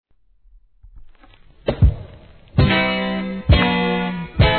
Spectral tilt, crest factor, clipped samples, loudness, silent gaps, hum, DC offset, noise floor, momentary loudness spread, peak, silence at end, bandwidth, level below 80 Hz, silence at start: -9.5 dB/octave; 18 dB; under 0.1%; -19 LUFS; none; none; 0.2%; -55 dBFS; 10 LU; -2 dBFS; 0 s; 4.5 kHz; -26 dBFS; 0.95 s